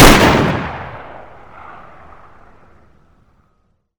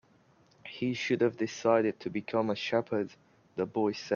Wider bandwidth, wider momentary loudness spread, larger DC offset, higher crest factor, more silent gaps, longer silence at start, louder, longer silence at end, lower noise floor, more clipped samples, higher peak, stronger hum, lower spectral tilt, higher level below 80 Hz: first, over 20 kHz vs 7.2 kHz; first, 29 LU vs 12 LU; neither; about the same, 16 dB vs 20 dB; neither; second, 0 s vs 0.65 s; first, -12 LUFS vs -31 LUFS; first, 2.8 s vs 0 s; about the same, -62 dBFS vs -64 dBFS; first, 0.8% vs under 0.1%; first, 0 dBFS vs -12 dBFS; neither; about the same, -4.5 dB/octave vs -5.5 dB/octave; first, -24 dBFS vs -74 dBFS